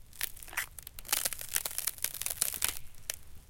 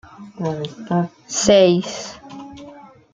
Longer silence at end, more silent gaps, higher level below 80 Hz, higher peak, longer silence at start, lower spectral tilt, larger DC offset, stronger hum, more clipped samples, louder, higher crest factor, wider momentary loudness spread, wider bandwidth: second, 0 s vs 0.35 s; neither; about the same, -54 dBFS vs -52 dBFS; second, -6 dBFS vs 0 dBFS; second, 0 s vs 0.2 s; second, 1 dB/octave vs -4.5 dB/octave; neither; neither; neither; second, -34 LUFS vs -18 LUFS; first, 32 dB vs 20 dB; second, 10 LU vs 24 LU; first, 17 kHz vs 9.6 kHz